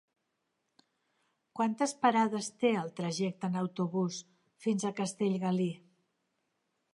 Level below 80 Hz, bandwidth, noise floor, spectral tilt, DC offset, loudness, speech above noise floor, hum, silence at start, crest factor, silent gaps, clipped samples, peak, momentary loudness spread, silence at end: -84 dBFS; 11.5 kHz; -82 dBFS; -5.5 dB/octave; under 0.1%; -32 LUFS; 50 dB; none; 1.55 s; 20 dB; none; under 0.1%; -14 dBFS; 8 LU; 1.15 s